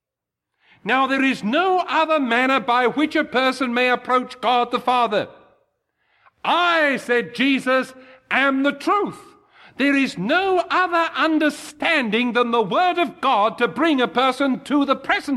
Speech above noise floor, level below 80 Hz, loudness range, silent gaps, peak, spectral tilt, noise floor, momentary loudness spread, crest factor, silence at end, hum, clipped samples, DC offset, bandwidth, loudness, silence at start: 65 dB; -64 dBFS; 2 LU; none; -4 dBFS; -4.5 dB/octave; -85 dBFS; 4 LU; 16 dB; 0 s; none; under 0.1%; under 0.1%; 13 kHz; -19 LUFS; 0.85 s